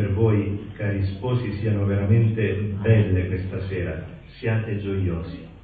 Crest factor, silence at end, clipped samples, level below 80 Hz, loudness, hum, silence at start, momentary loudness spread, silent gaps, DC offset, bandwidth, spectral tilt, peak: 16 dB; 0.05 s; under 0.1%; -38 dBFS; -24 LUFS; none; 0 s; 11 LU; none; under 0.1%; 4.7 kHz; -11.5 dB/octave; -6 dBFS